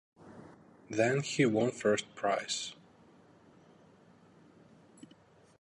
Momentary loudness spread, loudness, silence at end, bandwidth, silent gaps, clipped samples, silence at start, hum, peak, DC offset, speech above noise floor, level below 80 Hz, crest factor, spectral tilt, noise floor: 25 LU; -32 LUFS; 2.9 s; 11.5 kHz; none; under 0.1%; 0.25 s; none; -14 dBFS; under 0.1%; 31 dB; -76 dBFS; 22 dB; -4.5 dB/octave; -62 dBFS